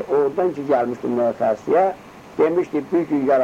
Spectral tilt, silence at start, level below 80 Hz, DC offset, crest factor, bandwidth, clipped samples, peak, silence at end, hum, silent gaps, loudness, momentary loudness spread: -7.5 dB/octave; 0 s; -60 dBFS; under 0.1%; 14 dB; 9.4 kHz; under 0.1%; -6 dBFS; 0 s; none; none; -20 LUFS; 4 LU